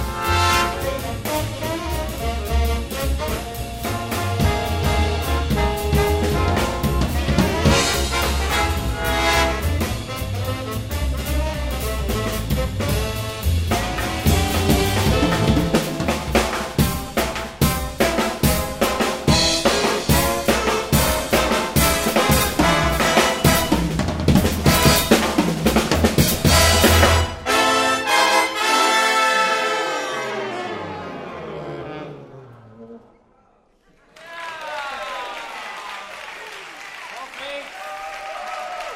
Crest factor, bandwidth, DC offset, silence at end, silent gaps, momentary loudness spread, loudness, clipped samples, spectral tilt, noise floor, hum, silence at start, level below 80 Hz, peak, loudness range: 20 dB; 16.5 kHz; under 0.1%; 0 s; none; 15 LU; -19 LUFS; under 0.1%; -4 dB/octave; -58 dBFS; none; 0 s; -28 dBFS; 0 dBFS; 16 LU